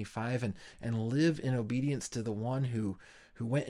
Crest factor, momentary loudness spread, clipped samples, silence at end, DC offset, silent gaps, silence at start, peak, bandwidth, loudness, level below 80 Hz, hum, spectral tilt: 16 dB; 10 LU; under 0.1%; 0 s; under 0.1%; none; 0 s; -18 dBFS; 11.5 kHz; -34 LUFS; -64 dBFS; none; -6.5 dB/octave